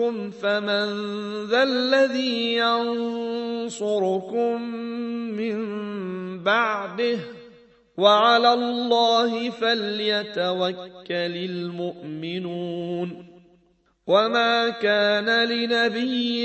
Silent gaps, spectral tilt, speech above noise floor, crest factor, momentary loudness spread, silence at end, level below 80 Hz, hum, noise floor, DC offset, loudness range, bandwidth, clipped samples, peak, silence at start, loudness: none; -4.5 dB/octave; 40 dB; 18 dB; 12 LU; 0 s; -72 dBFS; none; -63 dBFS; under 0.1%; 7 LU; 8.4 kHz; under 0.1%; -4 dBFS; 0 s; -23 LUFS